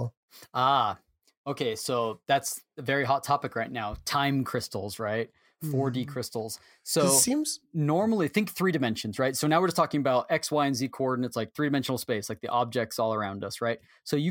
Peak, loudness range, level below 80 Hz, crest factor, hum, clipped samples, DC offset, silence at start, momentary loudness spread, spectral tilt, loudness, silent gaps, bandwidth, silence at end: -10 dBFS; 4 LU; -60 dBFS; 20 dB; none; under 0.1%; under 0.1%; 0 s; 10 LU; -4 dB/octave; -28 LUFS; 0.17-0.28 s, 1.37-1.44 s; 17 kHz; 0 s